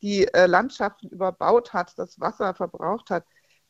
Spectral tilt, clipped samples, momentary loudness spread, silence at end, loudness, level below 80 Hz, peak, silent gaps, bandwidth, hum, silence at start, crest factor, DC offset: -5.5 dB/octave; under 0.1%; 12 LU; 0.5 s; -24 LUFS; -60 dBFS; -2 dBFS; none; 8 kHz; none; 0.05 s; 22 dB; under 0.1%